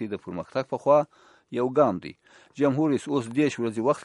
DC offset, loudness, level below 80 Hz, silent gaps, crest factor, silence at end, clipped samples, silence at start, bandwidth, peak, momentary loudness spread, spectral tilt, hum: under 0.1%; -25 LUFS; -68 dBFS; none; 20 dB; 0 s; under 0.1%; 0 s; 11.5 kHz; -6 dBFS; 13 LU; -7 dB/octave; none